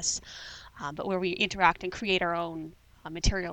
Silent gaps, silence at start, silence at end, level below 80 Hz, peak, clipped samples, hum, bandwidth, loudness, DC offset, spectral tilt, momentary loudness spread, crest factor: none; 0 s; 0 s; -42 dBFS; -8 dBFS; under 0.1%; none; 18.5 kHz; -29 LUFS; under 0.1%; -3 dB/octave; 18 LU; 24 dB